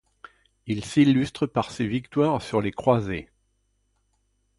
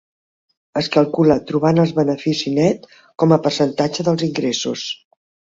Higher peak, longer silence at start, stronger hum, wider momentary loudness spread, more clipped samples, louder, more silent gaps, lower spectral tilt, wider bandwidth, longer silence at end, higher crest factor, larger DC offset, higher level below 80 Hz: second, -6 dBFS vs -2 dBFS; about the same, 0.65 s vs 0.75 s; first, 50 Hz at -55 dBFS vs none; about the same, 12 LU vs 10 LU; neither; second, -24 LUFS vs -18 LUFS; neither; about the same, -7 dB/octave vs -6 dB/octave; first, 11.5 kHz vs 7.8 kHz; first, 1.35 s vs 0.6 s; about the same, 20 dB vs 16 dB; neither; about the same, -54 dBFS vs -56 dBFS